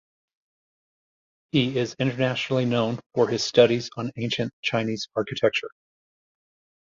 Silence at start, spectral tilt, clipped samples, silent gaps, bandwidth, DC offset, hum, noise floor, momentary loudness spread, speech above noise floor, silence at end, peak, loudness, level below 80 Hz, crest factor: 1.55 s; -5.5 dB/octave; under 0.1%; 3.06-3.10 s, 4.53-4.63 s; 7.6 kHz; under 0.1%; none; under -90 dBFS; 9 LU; over 66 dB; 1.15 s; -4 dBFS; -24 LUFS; -64 dBFS; 22 dB